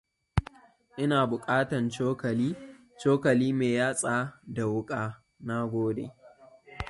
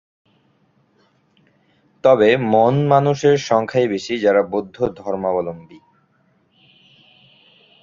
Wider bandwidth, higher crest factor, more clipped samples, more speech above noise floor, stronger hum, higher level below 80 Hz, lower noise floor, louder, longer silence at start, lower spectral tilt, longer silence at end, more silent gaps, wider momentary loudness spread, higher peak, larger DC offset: first, 11.5 kHz vs 7.6 kHz; about the same, 22 dB vs 18 dB; neither; second, 27 dB vs 44 dB; neither; first, -48 dBFS vs -58 dBFS; second, -55 dBFS vs -61 dBFS; second, -29 LUFS vs -17 LUFS; second, 0.35 s vs 2.05 s; about the same, -6 dB/octave vs -6.5 dB/octave; second, 0 s vs 2.05 s; neither; about the same, 11 LU vs 10 LU; second, -8 dBFS vs -2 dBFS; neither